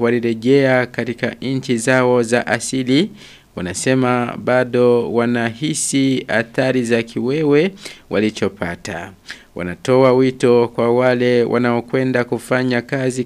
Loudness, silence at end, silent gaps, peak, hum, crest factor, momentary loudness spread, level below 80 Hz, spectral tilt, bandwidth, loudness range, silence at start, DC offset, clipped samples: -17 LUFS; 0 s; none; 0 dBFS; none; 16 dB; 11 LU; -54 dBFS; -5 dB/octave; 13.5 kHz; 3 LU; 0 s; under 0.1%; under 0.1%